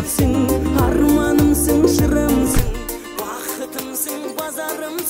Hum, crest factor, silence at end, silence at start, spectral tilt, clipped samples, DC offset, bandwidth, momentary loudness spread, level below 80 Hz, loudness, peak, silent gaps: none; 16 dB; 0 s; 0 s; -5.5 dB/octave; under 0.1%; under 0.1%; 16.5 kHz; 11 LU; -26 dBFS; -18 LUFS; -2 dBFS; none